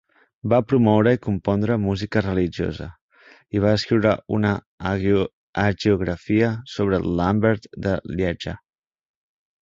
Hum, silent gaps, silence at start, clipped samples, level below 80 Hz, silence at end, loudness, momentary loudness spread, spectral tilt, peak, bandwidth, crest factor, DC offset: none; 3.01-3.09 s, 4.66-4.78 s, 5.33-5.53 s; 0.45 s; under 0.1%; -42 dBFS; 1.05 s; -22 LUFS; 9 LU; -7.5 dB/octave; -4 dBFS; 7.6 kHz; 18 dB; under 0.1%